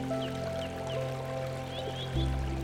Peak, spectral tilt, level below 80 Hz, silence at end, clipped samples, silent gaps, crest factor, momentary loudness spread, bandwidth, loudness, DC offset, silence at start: -18 dBFS; -6 dB/octave; -40 dBFS; 0 s; under 0.1%; none; 16 dB; 4 LU; 16 kHz; -35 LUFS; under 0.1%; 0 s